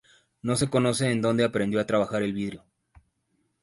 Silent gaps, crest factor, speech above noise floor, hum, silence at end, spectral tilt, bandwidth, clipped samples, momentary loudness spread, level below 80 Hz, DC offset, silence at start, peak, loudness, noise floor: none; 18 dB; 48 dB; none; 1.05 s; -5.5 dB/octave; 11.5 kHz; under 0.1%; 11 LU; -58 dBFS; under 0.1%; 0.45 s; -10 dBFS; -26 LUFS; -73 dBFS